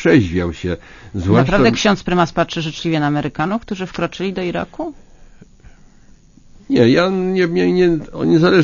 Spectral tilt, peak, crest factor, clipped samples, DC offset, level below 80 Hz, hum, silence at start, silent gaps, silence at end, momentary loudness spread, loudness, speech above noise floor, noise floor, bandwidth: -6.5 dB/octave; 0 dBFS; 16 dB; under 0.1%; under 0.1%; -38 dBFS; none; 0 s; none; 0 s; 12 LU; -17 LUFS; 30 dB; -45 dBFS; 7.4 kHz